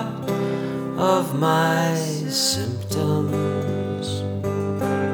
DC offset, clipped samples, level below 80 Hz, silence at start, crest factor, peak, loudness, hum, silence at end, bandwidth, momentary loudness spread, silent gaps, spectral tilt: under 0.1%; under 0.1%; -56 dBFS; 0 s; 18 dB; -4 dBFS; -23 LUFS; none; 0 s; over 20 kHz; 7 LU; none; -5 dB/octave